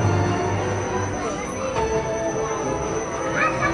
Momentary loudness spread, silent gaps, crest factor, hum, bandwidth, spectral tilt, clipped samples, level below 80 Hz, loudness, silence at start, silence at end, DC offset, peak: 5 LU; none; 16 dB; none; 11.5 kHz; -5 dB/octave; under 0.1%; -42 dBFS; -24 LUFS; 0 s; 0 s; under 0.1%; -8 dBFS